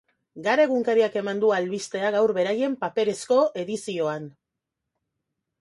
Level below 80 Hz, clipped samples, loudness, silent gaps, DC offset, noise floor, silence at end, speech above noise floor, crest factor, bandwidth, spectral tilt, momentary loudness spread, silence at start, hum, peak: -74 dBFS; under 0.1%; -24 LUFS; none; under 0.1%; -84 dBFS; 1.3 s; 60 dB; 16 dB; 11.5 kHz; -4.5 dB/octave; 9 LU; 0.35 s; none; -8 dBFS